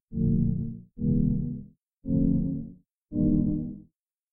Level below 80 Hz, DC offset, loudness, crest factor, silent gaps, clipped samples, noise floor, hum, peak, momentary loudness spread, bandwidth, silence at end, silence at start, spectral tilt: -38 dBFS; under 0.1%; -28 LUFS; 16 dB; 1.93-2.02 s; under 0.1%; -62 dBFS; none; -10 dBFS; 15 LU; 1.1 kHz; 0.5 s; 0.1 s; -17 dB/octave